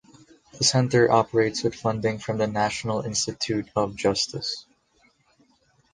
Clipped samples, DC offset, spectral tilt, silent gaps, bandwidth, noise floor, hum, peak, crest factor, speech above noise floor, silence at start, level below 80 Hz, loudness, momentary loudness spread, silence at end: under 0.1%; under 0.1%; -4 dB/octave; none; 10 kHz; -64 dBFS; none; -4 dBFS; 20 dB; 40 dB; 0.55 s; -56 dBFS; -24 LUFS; 8 LU; 1.3 s